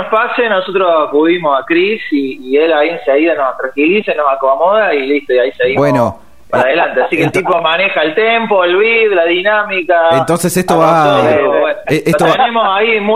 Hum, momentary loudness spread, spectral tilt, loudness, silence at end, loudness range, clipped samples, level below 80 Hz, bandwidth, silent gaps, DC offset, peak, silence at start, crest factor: none; 4 LU; -5 dB/octave; -11 LUFS; 0 s; 2 LU; under 0.1%; -50 dBFS; 16 kHz; none; 1%; 0 dBFS; 0 s; 10 dB